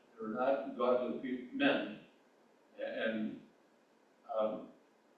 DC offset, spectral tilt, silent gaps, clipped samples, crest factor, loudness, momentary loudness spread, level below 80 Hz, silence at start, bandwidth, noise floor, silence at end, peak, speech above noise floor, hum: under 0.1%; -7 dB/octave; none; under 0.1%; 20 dB; -37 LUFS; 14 LU; -84 dBFS; 0.15 s; 6.8 kHz; -69 dBFS; 0.45 s; -18 dBFS; 33 dB; none